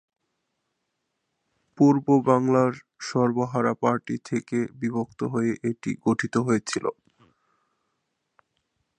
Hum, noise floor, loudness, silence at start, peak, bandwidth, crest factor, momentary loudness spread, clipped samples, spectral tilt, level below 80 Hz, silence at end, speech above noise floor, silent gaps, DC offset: none; -79 dBFS; -24 LUFS; 1.8 s; -4 dBFS; 9.8 kHz; 22 dB; 9 LU; under 0.1%; -6.5 dB/octave; -68 dBFS; 2.05 s; 55 dB; none; under 0.1%